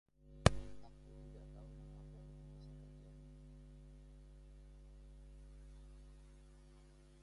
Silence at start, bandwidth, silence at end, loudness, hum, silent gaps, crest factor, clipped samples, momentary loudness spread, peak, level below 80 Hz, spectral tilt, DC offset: 0.2 s; 11.5 kHz; 0 s; -42 LUFS; none; none; 36 dB; under 0.1%; 21 LU; -10 dBFS; -54 dBFS; -5.5 dB/octave; under 0.1%